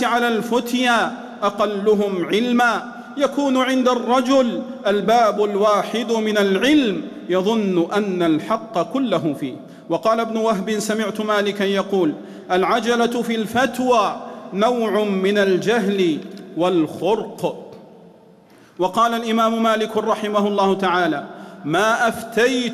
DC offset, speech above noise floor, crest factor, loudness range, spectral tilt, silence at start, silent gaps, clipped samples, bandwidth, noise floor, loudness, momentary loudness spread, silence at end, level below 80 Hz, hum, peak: under 0.1%; 30 dB; 12 dB; 3 LU; -5 dB/octave; 0 s; none; under 0.1%; 14 kHz; -48 dBFS; -19 LUFS; 7 LU; 0 s; -60 dBFS; none; -6 dBFS